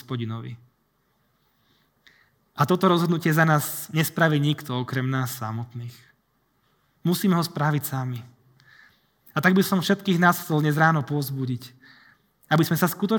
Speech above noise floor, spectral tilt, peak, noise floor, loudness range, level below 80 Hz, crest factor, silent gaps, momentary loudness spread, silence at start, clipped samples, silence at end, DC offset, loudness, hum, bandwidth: 46 dB; -5.5 dB/octave; -4 dBFS; -69 dBFS; 5 LU; -72 dBFS; 22 dB; none; 14 LU; 0.1 s; under 0.1%; 0 s; under 0.1%; -23 LUFS; none; over 20 kHz